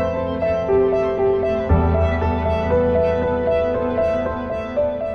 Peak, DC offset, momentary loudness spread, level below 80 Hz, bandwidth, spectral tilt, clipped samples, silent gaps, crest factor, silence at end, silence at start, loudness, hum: -4 dBFS; under 0.1%; 5 LU; -30 dBFS; 6.4 kHz; -9 dB/octave; under 0.1%; none; 14 dB; 0 s; 0 s; -19 LUFS; none